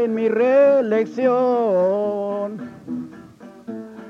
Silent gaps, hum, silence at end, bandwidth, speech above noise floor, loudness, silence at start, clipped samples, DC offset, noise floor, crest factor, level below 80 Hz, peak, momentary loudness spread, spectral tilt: none; none; 0 s; 6.8 kHz; 24 dB; -18 LUFS; 0 s; under 0.1%; under 0.1%; -42 dBFS; 14 dB; -68 dBFS; -6 dBFS; 19 LU; -8 dB/octave